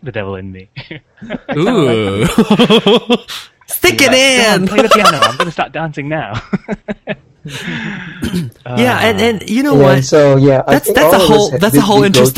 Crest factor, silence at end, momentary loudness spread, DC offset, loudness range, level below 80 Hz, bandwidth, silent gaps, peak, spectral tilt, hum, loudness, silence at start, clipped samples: 12 dB; 0.05 s; 19 LU; under 0.1%; 9 LU; -40 dBFS; 17 kHz; none; 0 dBFS; -4.5 dB/octave; none; -10 LUFS; 0.05 s; 0.5%